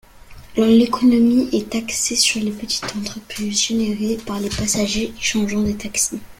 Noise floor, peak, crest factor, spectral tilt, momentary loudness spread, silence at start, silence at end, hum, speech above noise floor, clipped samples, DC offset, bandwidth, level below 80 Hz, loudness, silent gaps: -40 dBFS; -2 dBFS; 18 dB; -3 dB/octave; 10 LU; 0.15 s; 0.05 s; none; 22 dB; under 0.1%; under 0.1%; 16.5 kHz; -42 dBFS; -19 LUFS; none